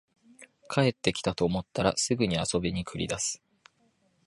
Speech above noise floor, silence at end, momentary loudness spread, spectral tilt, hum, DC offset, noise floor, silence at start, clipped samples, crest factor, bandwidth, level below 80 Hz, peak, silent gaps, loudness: 41 dB; 0.9 s; 6 LU; -4 dB/octave; none; under 0.1%; -69 dBFS; 0.4 s; under 0.1%; 24 dB; 11.5 kHz; -52 dBFS; -6 dBFS; none; -29 LUFS